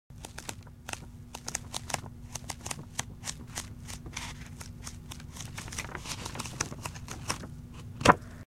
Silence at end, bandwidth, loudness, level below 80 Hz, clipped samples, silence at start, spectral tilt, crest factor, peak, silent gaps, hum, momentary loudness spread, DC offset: 0.05 s; 16.5 kHz; -35 LUFS; -50 dBFS; under 0.1%; 0.1 s; -3.5 dB/octave; 34 dB; -2 dBFS; none; none; 16 LU; under 0.1%